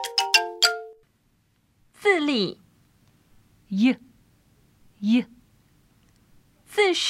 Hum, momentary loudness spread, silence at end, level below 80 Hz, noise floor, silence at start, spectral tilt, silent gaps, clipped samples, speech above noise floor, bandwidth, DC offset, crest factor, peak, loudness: none; 14 LU; 0 s; -68 dBFS; -66 dBFS; 0 s; -3 dB/octave; none; under 0.1%; 44 dB; 16 kHz; under 0.1%; 24 dB; -2 dBFS; -23 LUFS